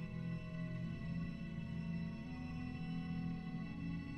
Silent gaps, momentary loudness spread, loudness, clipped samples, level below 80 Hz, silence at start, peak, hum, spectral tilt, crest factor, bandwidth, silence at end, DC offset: none; 3 LU; -45 LUFS; under 0.1%; -58 dBFS; 0 s; -32 dBFS; none; -8.5 dB/octave; 12 dB; 6.4 kHz; 0 s; under 0.1%